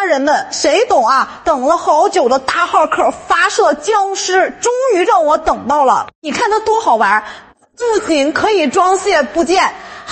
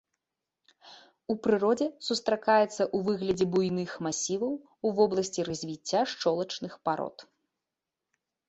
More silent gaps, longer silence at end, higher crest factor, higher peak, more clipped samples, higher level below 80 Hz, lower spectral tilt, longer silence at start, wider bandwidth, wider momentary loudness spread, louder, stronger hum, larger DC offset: first, 6.15-6.22 s vs none; second, 0 s vs 1.25 s; second, 12 dB vs 20 dB; first, 0 dBFS vs -10 dBFS; neither; first, -46 dBFS vs -68 dBFS; second, -2 dB/octave vs -4.5 dB/octave; second, 0 s vs 0.85 s; about the same, 8.4 kHz vs 8.2 kHz; second, 5 LU vs 9 LU; first, -13 LUFS vs -29 LUFS; neither; neither